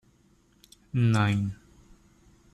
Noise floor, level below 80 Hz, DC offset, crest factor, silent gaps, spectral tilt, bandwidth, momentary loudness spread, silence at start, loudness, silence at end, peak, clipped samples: -63 dBFS; -58 dBFS; under 0.1%; 16 dB; none; -7 dB/octave; 11.5 kHz; 13 LU; 0.95 s; -27 LUFS; 1 s; -14 dBFS; under 0.1%